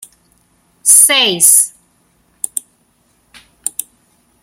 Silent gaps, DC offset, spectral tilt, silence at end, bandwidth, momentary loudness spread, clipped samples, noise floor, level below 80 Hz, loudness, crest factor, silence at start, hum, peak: none; under 0.1%; 1 dB/octave; 0.75 s; over 20 kHz; 19 LU; 0.3%; -57 dBFS; -64 dBFS; -9 LUFS; 16 dB; 0.85 s; none; 0 dBFS